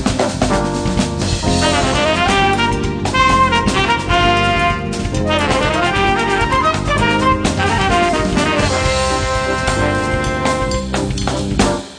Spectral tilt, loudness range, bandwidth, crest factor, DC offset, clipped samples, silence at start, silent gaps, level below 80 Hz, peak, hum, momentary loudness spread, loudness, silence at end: -4.5 dB/octave; 2 LU; 10.5 kHz; 14 dB; under 0.1%; under 0.1%; 0 s; none; -26 dBFS; 0 dBFS; none; 5 LU; -15 LUFS; 0 s